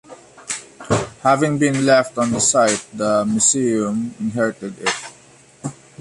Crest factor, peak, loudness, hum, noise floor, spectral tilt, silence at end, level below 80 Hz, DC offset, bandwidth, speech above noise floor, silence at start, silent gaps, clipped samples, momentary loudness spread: 16 dB; -2 dBFS; -18 LUFS; none; -48 dBFS; -4 dB/octave; 0.3 s; -54 dBFS; under 0.1%; 11.5 kHz; 30 dB; 0.1 s; none; under 0.1%; 16 LU